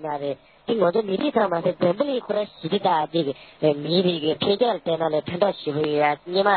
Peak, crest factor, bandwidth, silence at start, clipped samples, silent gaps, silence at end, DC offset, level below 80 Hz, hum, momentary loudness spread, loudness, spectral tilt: -6 dBFS; 16 dB; 4.6 kHz; 0 s; under 0.1%; none; 0 s; under 0.1%; -64 dBFS; none; 6 LU; -23 LUFS; -10.5 dB/octave